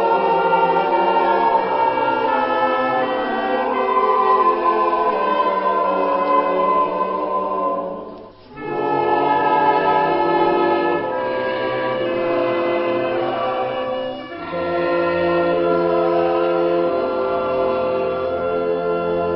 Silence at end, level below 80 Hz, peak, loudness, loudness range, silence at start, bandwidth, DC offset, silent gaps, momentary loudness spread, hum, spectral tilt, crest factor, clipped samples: 0 s; -52 dBFS; -4 dBFS; -18 LUFS; 3 LU; 0 s; 5.8 kHz; under 0.1%; none; 6 LU; none; -10.5 dB/octave; 14 dB; under 0.1%